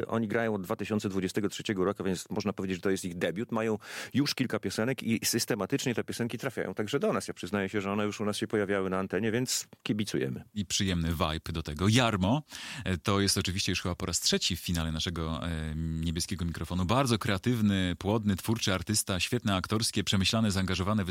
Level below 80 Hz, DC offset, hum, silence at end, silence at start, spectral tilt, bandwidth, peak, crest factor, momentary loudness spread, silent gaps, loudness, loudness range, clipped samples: -52 dBFS; under 0.1%; none; 0 s; 0 s; -4.5 dB/octave; 16.5 kHz; -10 dBFS; 20 dB; 7 LU; none; -30 LUFS; 3 LU; under 0.1%